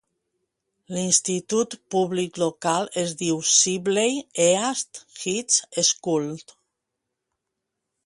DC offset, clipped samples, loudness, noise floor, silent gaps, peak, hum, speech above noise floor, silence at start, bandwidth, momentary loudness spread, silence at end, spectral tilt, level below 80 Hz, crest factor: under 0.1%; under 0.1%; -22 LUFS; -82 dBFS; none; -4 dBFS; none; 59 dB; 0.9 s; 11.5 kHz; 11 LU; 1.65 s; -2.5 dB/octave; -70 dBFS; 20 dB